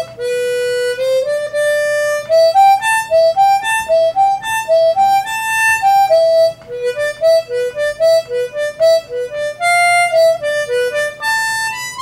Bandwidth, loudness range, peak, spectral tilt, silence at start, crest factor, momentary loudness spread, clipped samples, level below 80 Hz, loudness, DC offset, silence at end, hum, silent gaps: 16 kHz; 2 LU; -2 dBFS; -1 dB/octave; 0 s; 12 dB; 8 LU; under 0.1%; -54 dBFS; -14 LUFS; under 0.1%; 0 s; none; none